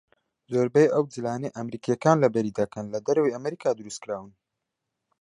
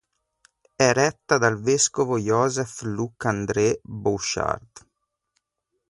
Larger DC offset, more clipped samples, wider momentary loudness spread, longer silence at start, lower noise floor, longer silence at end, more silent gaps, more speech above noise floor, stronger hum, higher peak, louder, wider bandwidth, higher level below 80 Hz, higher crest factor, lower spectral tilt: neither; neither; first, 13 LU vs 8 LU; second, 0.5 s vs 0.8 s; first, -83 dBFS vs -79 dBFS; second, 0.9 s vs 1.1 s; neither; about the same, 59 dB vs 56 dB; neither; about the same, -4 dBFS vs -4 dBFS; about the same, -25 LUFS vs -23 LUFS; about the same, 10.5 kHz vs 11.5 kHz; second, -68 dBFS vs -54 dBFS; about the same, 22 dB vs 20 dB; first, -6.5 dB/octave vs -4 dB/octave